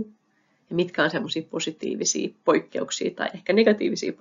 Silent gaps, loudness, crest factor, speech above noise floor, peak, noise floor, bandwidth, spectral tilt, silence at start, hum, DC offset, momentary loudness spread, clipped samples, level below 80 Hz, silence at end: none; -25 LUFS; 20 dB; 43 dB; -6 dBFS; -67 dBFS; 7.6 kHz; -3.5 dB/octave; 0 s; none; under 0.1%; 9 LU; under 0.1%; -72 dBFS; 0.05 s